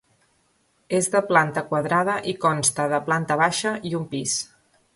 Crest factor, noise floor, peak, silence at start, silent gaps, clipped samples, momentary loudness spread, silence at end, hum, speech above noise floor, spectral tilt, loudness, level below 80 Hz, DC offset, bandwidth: 20 dB; -66 dBFS; -4 dBFS; 0.9 s; none; under 0.1%; 7 LU; 0.5 s; none; 43 dB; -3.5 dB/octave; -22 LUFS; -64 dBFS; under 0.1%; 12 kHz